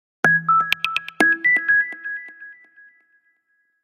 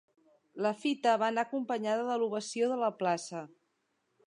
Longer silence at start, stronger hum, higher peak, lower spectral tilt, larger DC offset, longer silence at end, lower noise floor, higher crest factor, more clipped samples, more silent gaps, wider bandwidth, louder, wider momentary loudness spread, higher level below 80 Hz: second, 0.25 s vs 0.55 s; neither; first, 0 dBFS vs -16 dBFS; about the same, -3.5 dB/octave vs -4.5 dB/octave; neither; first, 1.3 s vs 0.8 s; second, -68 dBFS vs -78 dBFS; about the same, 22 dB vs 18 dB; neither; neither; first, 16 kHz vs 11 kHz; first, -18 LUFS vs -32 LUFS; first, 15 LU vs 12 LU; first, -70 dBFS vs -88 dBFS